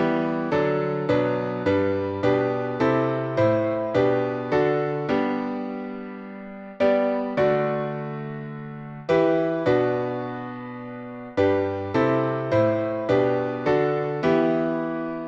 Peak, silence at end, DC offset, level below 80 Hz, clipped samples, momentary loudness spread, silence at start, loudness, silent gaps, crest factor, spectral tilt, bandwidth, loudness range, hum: -8 dBFS; 0 s; under 0.1%; -58 dBFS; under 0.1%; 13 LU; 0 s; -23 LUFS; none; 14 dB; -8.5 dB/octave; 7.4 kHz; 3 LU; none